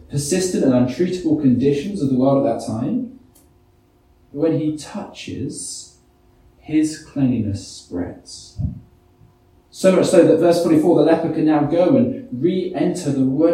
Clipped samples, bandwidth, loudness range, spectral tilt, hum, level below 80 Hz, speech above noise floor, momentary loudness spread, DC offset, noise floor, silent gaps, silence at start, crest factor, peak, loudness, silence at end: under 0.1%; 14 kHz; 10 LU; -6.5 dB/octave; none; -48 dBFS; 37 dB; 16 LU; under 0.1%; -55 dBFS; none; 0.1 s; 18 dB; 0 dBFS; -18 LUFS; 0 s